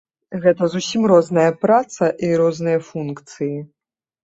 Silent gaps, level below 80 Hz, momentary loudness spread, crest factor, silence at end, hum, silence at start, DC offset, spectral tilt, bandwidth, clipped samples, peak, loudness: none; -62 dBFS; 13 LU; 16 dB; 0.6 s; none; 0.3 s; under 0.1%; -6 dB/octave; 8 kHz; under 0.1%; -2 dBFS; -18 LUFS